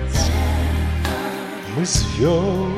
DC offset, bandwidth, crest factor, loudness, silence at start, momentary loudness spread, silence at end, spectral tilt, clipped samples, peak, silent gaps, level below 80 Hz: under 0.1%; 15.5 kHz; 14 dB; -21 LUFS; 0 s; 8 LU; 0 s; -5 dB/octave; under 0.1%; -4 dBFS; none; -24 dBFS